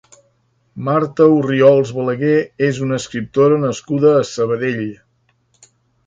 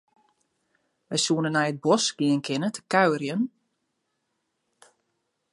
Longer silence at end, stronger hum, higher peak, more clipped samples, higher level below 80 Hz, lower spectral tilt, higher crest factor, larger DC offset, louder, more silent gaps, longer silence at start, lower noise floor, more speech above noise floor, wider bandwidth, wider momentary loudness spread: second, 1.1 s vs 2.05 s; neither; first, 0 dBFS vs -4 dBFS; neither; first, -56 dBFS vs -78 dBFS; first, -6.5 dB/octave vs -4 dB/octave; second, 16 dB vs 22 dB; neither; first, -16 LUFS vs -25 LUFS; neither; second, 0.75 s vs 1.1 s; second, -61 dBFS vs -77 dBFS; second, 46 dB vs 53 dB; second, 9 kHz vs 11.5 kHz; about the same, 9 LU vs 7 LU